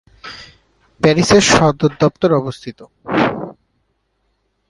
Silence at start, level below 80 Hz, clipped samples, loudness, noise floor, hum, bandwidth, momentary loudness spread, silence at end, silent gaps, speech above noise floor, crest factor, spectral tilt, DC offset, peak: 0.25 s; -44 dBFS; under 0.1%; -14 LUFS; -66 dBFS; none; 11.5 kHz; 23 LU; 1.2 s; none; 52 dB; 16 dB; -4.5 dB/octave; under 0.1%; 0 dBFS